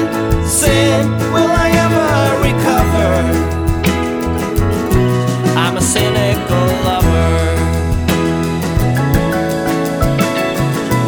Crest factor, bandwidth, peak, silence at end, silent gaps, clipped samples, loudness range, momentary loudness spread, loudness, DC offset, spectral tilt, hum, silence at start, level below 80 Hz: 12 dB; over 20 kHz; 0 dBFS; 0 s; none; under 0.1%; 2 LU; 4 LU; -14 LUFS; under 0.1%; -5.5 dB/octave; none; 0 s; -24 dBFS